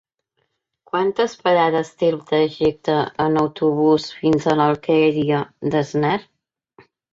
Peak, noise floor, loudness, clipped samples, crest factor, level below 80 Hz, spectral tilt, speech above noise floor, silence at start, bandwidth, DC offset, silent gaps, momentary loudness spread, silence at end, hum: -4 dBFS; -72 dBFS; -19 LUFS; under 0.1%; 16 dB; -56 dBFS; -6.5 dB/octave; 53 dB; 0.95 s; 7.8 kHz; under 0.1%; none; 5 LU; 0.9 s; none